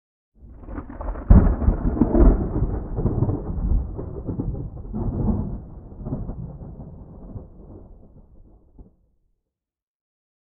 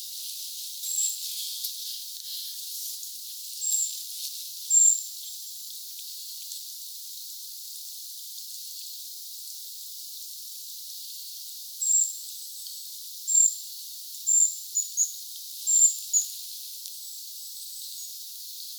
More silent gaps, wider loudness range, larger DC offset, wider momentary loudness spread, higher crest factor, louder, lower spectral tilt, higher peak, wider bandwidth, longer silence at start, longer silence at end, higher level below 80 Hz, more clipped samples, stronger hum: neither; first, 19 LU vs 13 LU; neither; first, 23 LU vs 17 LU; about the same, 22 dB vs 22 dB; first, -23 LUFS vs -27 LUFS; first, -13.5 dB/octave vs 12.5 dB/octave; first, -2 dBFS vs -8 dBFS; second, 2.3 kHz vs over 20 kHz; first, 0.4 s vs 0 s; first, 1.65 s vs 0 s; first, -26 dBFS vs under -90 dBFS; neither; neither